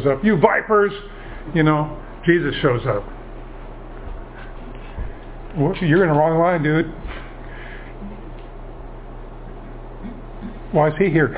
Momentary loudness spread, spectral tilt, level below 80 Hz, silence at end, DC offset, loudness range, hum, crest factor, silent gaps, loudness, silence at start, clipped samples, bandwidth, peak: 22 LU; -11 dB/octave; -36 dBFS; 0 s; under 0.1%; 16 LU; none; 20 dB; none; -18 LUFS; 0 s; under 0.1%; 4 kHz; 0 dBFS